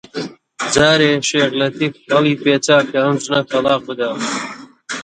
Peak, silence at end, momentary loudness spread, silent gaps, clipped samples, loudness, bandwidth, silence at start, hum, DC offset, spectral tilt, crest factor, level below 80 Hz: 0 dBFS; 0 s; 15 LU; none; under 0.1%; -16 LUFS; 10.5 kHz; 0.15 s; none; under 0.1%; -4 dB/octave; 16 dB; -52 dBFS